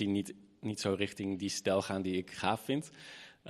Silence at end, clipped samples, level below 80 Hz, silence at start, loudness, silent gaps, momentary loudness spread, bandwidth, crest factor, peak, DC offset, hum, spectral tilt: 0 s; under 0.1%; -72 dBFS; 0 s; -35 LUFS; none; 13 LU; 13 kHz; 22 dB; -14 dBFS; under 0.1%; none; -4.5 dB/octave